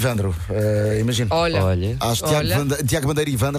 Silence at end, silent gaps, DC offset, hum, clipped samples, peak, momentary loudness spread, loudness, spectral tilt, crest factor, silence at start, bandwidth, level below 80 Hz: 0 s; none; under 0.1%; none; under 0.1%; -6 dBFS; 3 LU; -20 LUFS; -5.5 dB/octave; 12 dB; 0 s; 15.5 kHz; -38 dBFS